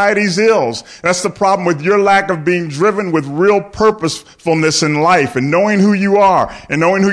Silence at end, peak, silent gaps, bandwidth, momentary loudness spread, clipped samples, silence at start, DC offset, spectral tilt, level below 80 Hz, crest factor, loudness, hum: 0 s; -2 dBFS; none; 11 kHz; 7 LU; under 0.1%; 0 s; under 0.1%; -5 dB/octave; -46 dBFS; 10 dB; -13 LUFS; none